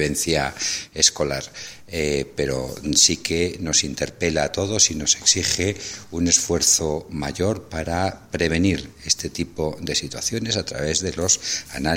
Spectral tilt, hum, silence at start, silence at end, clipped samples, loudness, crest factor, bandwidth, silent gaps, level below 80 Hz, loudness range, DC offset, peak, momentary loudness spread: -2.5 dB/octave; none; 0 s; 0 s; under 0.1%; -21 LUFS; 20 dB; 16.5 kHz; none; -42 dBFS; 5 LU; under 0.1%; -2 dBFS; 11 LU